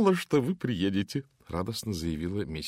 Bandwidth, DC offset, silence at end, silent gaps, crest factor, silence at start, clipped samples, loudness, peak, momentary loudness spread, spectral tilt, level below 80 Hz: 16 kHz; under 0.1%; 0 s; none; 16 dB; 0 s; under 0.1%; -30 LUFS; -12 dBFS; 8 LU; -6 dB/octave; -50 dBFS